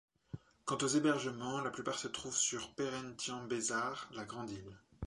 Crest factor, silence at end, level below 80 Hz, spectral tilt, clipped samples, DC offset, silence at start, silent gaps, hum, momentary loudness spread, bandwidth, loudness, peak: 18 dB; 0 s; -66 dBFS; -3 dB/octave; under 0.1%; under 0.1%; 0.35 s; none; none; 15 LU; 11.5 kHz; -38 LUFS; -20 dBFS